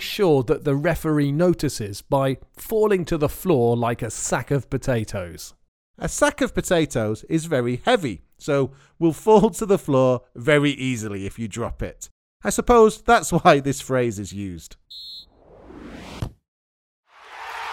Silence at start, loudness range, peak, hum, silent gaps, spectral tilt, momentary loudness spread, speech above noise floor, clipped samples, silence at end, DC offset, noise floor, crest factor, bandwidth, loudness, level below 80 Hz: 0 s; 4 LU; 0 dBFS; none; 5.68-5.94 s, 12.11-12.40 s, 16.48-17.03 s; -5.5 dB/octave; 19 LU; 27 dB; under 0.1%; 0 s; under 0.1%; -48 dBFS; 20 dB; 18.5 kHz; -21 LUFS; -42 dBFS